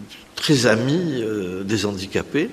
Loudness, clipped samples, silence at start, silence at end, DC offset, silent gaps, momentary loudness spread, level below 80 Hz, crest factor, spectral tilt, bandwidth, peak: -21 LUFS; under 0.1%; 0 s; 0 s; under 0.1%; none; 9 LU; -54 dBFS; 20 dB; -5 dB/octave; 14.5 kHz; -2 dBFS